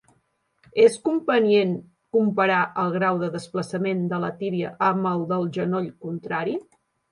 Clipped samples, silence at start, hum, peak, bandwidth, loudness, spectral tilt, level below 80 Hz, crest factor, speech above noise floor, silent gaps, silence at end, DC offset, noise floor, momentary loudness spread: under 0.1%; 0.75 s; none; -4 dBFS; 11.5 kHz; -23 LUFS; -6.5 dB/octave; -68 dBFS; 18 dB; 46 dB; none; 0.5 s; under 0.1%; -69 dBFS; 11 LU